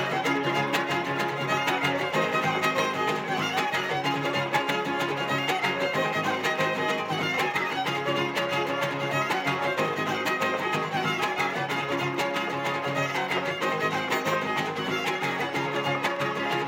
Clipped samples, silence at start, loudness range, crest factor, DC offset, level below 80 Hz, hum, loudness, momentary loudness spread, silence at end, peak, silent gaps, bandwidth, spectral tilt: under 0.1%; 0 s; 1 LU; 16 dB; under 0.1%; -70 dBFS; none; -26 LUFS; 3 LU; 0 s; -10 dBFS; none; 17 kHz; -4 dB/octave